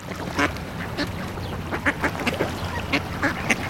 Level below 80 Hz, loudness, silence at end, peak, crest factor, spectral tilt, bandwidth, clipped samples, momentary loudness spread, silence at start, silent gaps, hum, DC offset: -42 dBFS; -26 LUFS; 0 s; -2 dBFS; 24 dB; -4.5 dB/octave; 17 kHz; under 0.1%; 7 LU; 0 s; none; none; 0.2%